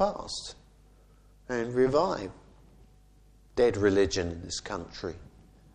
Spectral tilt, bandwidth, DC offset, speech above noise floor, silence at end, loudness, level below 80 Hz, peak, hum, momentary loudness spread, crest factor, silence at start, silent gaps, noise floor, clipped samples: -5 dB/octave; 10 kHz; under 0.1%; 30 dB; 0.5 s; -29 LUFS; -52 dBFS; -10 dBFS; 50 Hz at -55 dBFS; 15 LU; 20 dB; 0 s; none; -58 dBFS; under 0.1%